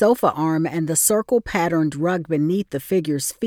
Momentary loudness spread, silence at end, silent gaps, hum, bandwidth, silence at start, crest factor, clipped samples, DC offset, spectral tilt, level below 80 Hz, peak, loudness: 6 LU; 0 s; none; none; 19 kHz; 0 s; 16 dB; under 0.1%; under 0.1%; -5 dB/octave; -52 dBFS; -4 dBFS; -20 LUFS